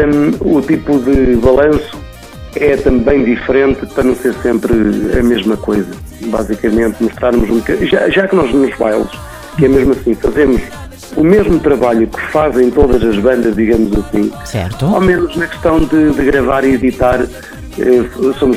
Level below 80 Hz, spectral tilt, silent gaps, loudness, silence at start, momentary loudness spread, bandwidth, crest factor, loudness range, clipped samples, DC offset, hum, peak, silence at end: -26 dBFS; -7 dB/octave; none; -12 LUFS; 0 s; 9 LU; 15.5 kHz; 12 dB; 2 LU; 0.2%; under 0.1%; none; 0 dBFS; 0 s